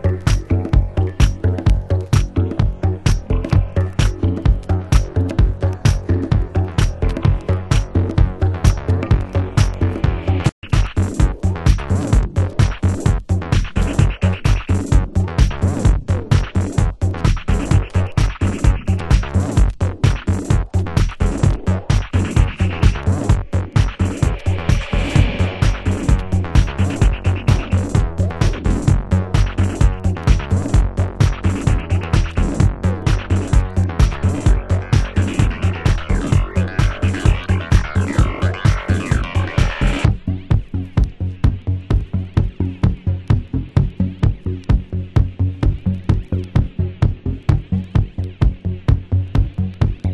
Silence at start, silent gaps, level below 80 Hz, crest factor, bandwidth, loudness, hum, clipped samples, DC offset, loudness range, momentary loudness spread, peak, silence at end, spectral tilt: 0 s; 10.52-10.62 s; -20 dBFS; 16 dB; 11.5 kHz; -18 LUFS; none; under 0.1%; under 0.1%; 2 LU; 3 LU; 0 dBFS; 0 s; -7 dB/octave